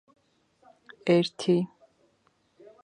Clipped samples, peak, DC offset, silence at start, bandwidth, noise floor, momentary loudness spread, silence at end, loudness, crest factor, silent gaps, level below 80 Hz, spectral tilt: under 0.1%; -10 dBFS; under 0.1%; 1.05 s; 10.5 kHz; -69 dBFS; 11 LU; 1.2 s; -26 LUFS; 20 dB; none; -78 dBFS; -6.5 dB/octave